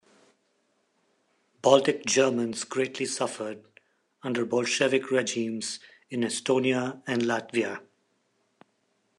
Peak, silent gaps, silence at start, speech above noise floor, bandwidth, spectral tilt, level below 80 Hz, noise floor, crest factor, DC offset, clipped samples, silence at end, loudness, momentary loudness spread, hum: -4 dBFS; none; 1.65 s; 46 dB; 12 kHz; -3.5 dB/octave; -80 dBFS; -72 dBFS; 26 dB; under 0.1%; under 0.1%; 1.35 s; -27 LUFS; 14 LU; none